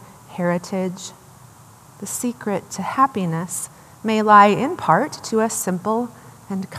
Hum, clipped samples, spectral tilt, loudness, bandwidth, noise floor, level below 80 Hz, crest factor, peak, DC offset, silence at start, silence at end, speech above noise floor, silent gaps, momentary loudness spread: none; under 0.1%; -5 dB/octave; -20 LUFS; 15 kHz; -46 dBFS; -64 dBFS; 20 dB; 0 dBFS; under 0.1%; 0 s; 0 s; 26 dB; none; 18 LU